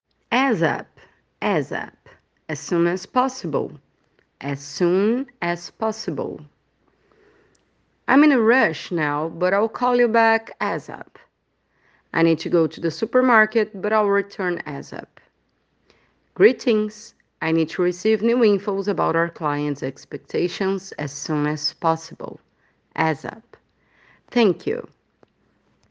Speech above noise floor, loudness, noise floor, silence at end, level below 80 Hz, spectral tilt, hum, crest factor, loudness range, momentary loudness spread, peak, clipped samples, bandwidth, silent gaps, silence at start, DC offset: 48 dB; -21 LUFS; -69 dBFS; 1.05 s; -68 dBFS; -5.5 dB/octave; none; 22 dB; 6 LU; 15 LU; 0 dBFS; under 0.1%; 8 kHz; none; 0.3 s; under 0.1%